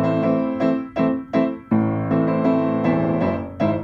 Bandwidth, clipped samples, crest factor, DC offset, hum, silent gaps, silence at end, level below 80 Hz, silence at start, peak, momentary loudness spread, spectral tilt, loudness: 5.8 kHz; under 0.1%; 14 dB; under 0.1%; none; none; 0 s; -52 dBFS; 0 s; -6 dBFS; 3 LU; -10 dB/octave; -21 LUFS